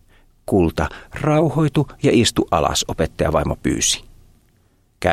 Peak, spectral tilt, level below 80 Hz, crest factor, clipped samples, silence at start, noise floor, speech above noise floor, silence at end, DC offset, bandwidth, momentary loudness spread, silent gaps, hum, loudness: 0 dBFS; -4.5 dB/octave; -36 dBFS; 18 dB; under 0.1%; 0.5 s; -58 dBFS; 40 dB; 0 s; under 0.1%; 15 kHz; 8 LU; none; none; -19 LUFS